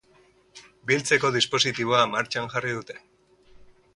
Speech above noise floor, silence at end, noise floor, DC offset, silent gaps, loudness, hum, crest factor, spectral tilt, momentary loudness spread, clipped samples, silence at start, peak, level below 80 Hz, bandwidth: 35 dB; 1 s; -59 dBFS; under 0.1%; none; -23 LUFS; none; 22 dB; -3 dB/octave; 15 LU; under 0.1%; 0.55 s; -6 dBFS; -62 dBFS; 11.5 kHz